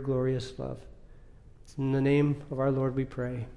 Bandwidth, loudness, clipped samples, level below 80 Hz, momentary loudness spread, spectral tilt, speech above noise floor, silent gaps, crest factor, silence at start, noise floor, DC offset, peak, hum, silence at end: 10.5 kHz; -30 LUFS; under 0.1%; -50 dBFS; 14 LU; -8.5 dB/octave; 22 dB; none; 14 dB; 0 s; -51 dBFS; under 0.1%; -16 dBFS; none; 0 s